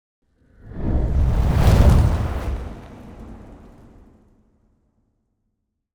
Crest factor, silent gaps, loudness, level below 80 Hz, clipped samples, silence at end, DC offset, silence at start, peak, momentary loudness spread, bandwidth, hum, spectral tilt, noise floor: 16 dB; none; -20 LUFS; -24 dBFS; under 0.1%; 2.4 s; under 0.1%; 0.7 s; -6 dBFS; 25 LU; over 20 kHz; none; -7.5 dB/octave; -75 dBFS